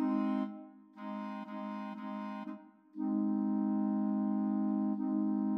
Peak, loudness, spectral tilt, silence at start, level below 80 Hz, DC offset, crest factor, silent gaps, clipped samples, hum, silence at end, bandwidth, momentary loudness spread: -24 dBFS; -35 LUFS; -10 dB/octave; 0 s; under -90 dBFS; under 0.1%; 12 dB; none; under 0.1%; none; 0 s; 5.2 kHz; 14 LU